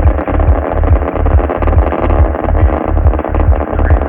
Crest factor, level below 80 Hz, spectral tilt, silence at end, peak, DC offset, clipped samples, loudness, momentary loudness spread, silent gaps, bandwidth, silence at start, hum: 10 dB; -12 dBFS; -12 dB/octave; 0 s; 0 dBFS; under 0.1%; under 0.1%; -13 LUFS; 1 LU; none; 3.4 kHz; 0 s; none